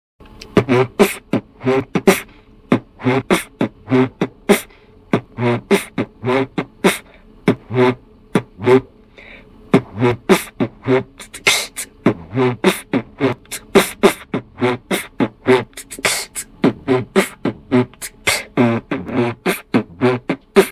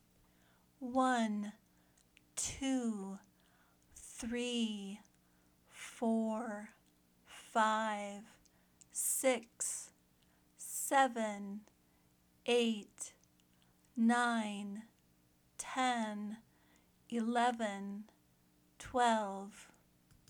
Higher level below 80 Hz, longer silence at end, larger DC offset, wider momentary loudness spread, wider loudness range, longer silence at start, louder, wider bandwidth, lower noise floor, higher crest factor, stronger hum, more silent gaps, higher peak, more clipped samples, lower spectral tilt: first, -48 dBFS vs -72 dBFS; second, 0 s vs 0.65 s; neither; second, 8 LU vs 19 LU; about the same, 2 LU vs 4 LU; second, 0.4 s vs 0.8 s; first, -18 LUFS vs -37 LUFS; second, 16 kHz vs 20 kHz; second, -44 dBFS vs -71 dBFS; about the same, 18 dB vs 22 dB; neither; neither; first, 0 dBFS vs -16 dBFS; neither; first, -5 dB/octave vs -3 dB/octave